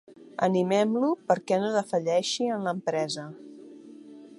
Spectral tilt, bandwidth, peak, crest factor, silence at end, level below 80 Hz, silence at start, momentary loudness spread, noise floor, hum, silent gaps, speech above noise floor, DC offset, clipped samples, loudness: -5 dB/octave; 11.5 kHz; -8 dBFS; 20 dB; 0.05 s; -78 dBFS; 0.1 s; 23 LU; -47 dBFS; none; none; 21 dB; under 0.1%; under 0.1%; -27 LUFS